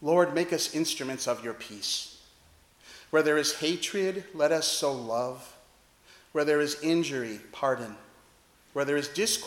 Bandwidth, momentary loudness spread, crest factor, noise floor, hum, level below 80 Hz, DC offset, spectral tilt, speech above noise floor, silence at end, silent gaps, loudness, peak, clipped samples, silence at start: 17.5 kHz; 10 LU; 20 dB; -61 dBFS; none; -70 dBFS; under 0.1%; -3 dB/octave; 32 dB; 0 s; none; -29 LUFS; -10 dBFS; under 0.1%; 0 s